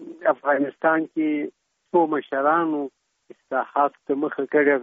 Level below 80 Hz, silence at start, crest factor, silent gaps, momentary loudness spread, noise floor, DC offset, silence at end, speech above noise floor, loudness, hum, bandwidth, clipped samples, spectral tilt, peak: -74 dBFS; 0 s; 18 dB; none; 8 LU; -52 dBFS; under 0.1%; 0 s; 30 dB; -23 LUFS; none; 3.8 kHz; under 0.1%; -4.5 dB/octave; -6 dBFS